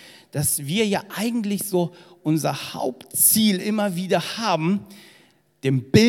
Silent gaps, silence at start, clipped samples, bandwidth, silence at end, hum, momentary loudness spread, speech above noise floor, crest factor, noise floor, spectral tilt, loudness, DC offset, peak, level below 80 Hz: none; 0.05 s; under 0.1%; 17.5 kHz; 0 s; none; 12 LU; 35 dB; 22 dB; -57 dBFS; -4 dB/octave; -22 LUFS; under 0.1%; 0 dBFS; -62 dBFS